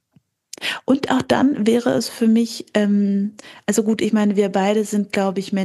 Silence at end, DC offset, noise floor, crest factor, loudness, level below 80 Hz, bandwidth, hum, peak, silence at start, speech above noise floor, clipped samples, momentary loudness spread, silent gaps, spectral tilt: 0 s; under 0.1%; -60 dBFS; 16 dB; -19 LUFS; -62 dBFS; 12.5 kHz; none; -2 dBFS; 0.6 s; 42 dB; under 0.1%; 6 LU; none; -5.5 dB/octave